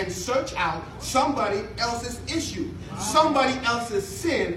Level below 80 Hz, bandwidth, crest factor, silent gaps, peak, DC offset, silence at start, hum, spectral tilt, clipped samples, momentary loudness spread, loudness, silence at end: -46 dBFS; 16 kHz; 20 dB; none; -6 dBFS; under 0.1%; 0 s; none; -3.5 dB/octave; under 0.1%; 10 LU; -25 LUFS; 0 s